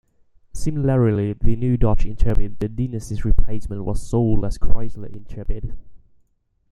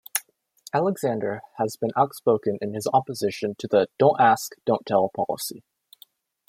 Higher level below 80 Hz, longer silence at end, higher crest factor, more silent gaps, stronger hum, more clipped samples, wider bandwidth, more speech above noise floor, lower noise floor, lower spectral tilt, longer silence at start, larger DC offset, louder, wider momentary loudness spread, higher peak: first, -24 dBFS vs -70 dBFS; second, 0.75 s vs 0.9 s; second, 16 dB vs 22 dB; neither; neither; neither; second, 10 kHz vs 16.5 kHz; first, 48 dB vs 33 dB; first, -63 dBFS vs -56 dBFS; first, -8.5 dB/octave vs -5 dB/octave; first, 0.55 s vs 0.15 s; neither; about the same, -23 LUFS vs -24 LUFS; first, 14 LU vs 10 LU; about the same, 0 dBFS vs -2 dBFS